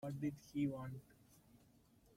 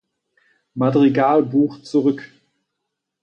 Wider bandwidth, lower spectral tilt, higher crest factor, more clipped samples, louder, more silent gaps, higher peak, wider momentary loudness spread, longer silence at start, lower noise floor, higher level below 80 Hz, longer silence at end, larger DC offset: first, 16 kHz vs 8 kHz; about the same, -7.5 dB/octave vs -8.5 dB/octave; about the same, 18 dB vs 14 dB; neither; second, -44 LUFS vs -18 LUFS; neither; second, -30 dBFS vs -6 dBFS; about the same, 11 LU vs 9 LU; second, 0 s vs 0.75 s; second, -70 dBFS vs -79 dBFS; second, -74 dBFS vs -66 dBFS; second, 0.6 s vs 0.95 s; neither